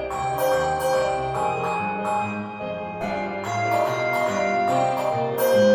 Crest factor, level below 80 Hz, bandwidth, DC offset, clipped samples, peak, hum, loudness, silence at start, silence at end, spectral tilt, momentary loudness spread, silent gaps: 16 dB; -52 dBFS; 18 kHz; under 0.1%; under 0.1%; -8 dBFS; none; -24 LUFS; 0 s; 0 s; -5 dB/octave; 7 LU; none